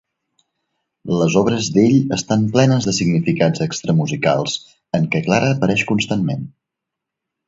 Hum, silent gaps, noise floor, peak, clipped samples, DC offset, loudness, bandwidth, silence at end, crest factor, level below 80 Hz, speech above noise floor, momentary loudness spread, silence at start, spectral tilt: none; none; -82 dBFS; 0 dBFS; under 0.1%; under 0.1%; -17 LUFS; 7.8 kHz; 1 s; 18 dB; -52 dBFS; 66 dB; 9 LU; 1.05 s; -5.5 dB/octave